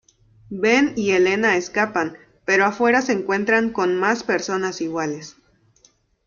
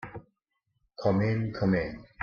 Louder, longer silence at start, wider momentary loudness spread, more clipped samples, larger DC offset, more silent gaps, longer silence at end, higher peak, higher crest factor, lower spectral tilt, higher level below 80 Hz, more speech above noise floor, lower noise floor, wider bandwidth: first, -20 LUFS vs -29 LUFS; first, 0.5 s vs 0 s; second, 11 LU vs 16 LU; neither; neither; neither; first, 0.95 s vs 0 s; first, -4 dBFS vs -12 dBFS; about the same, 18 dB vs 18 dB; second, -4.5 dB/octave vs -9 dB/octave; second, -60 dBFS vs -54 dBFS; second, 39 dB vs 52 dB; second, -59 dBFS vs -79 dBFS; about the same, 7.2 kHz vs 6.8 kHz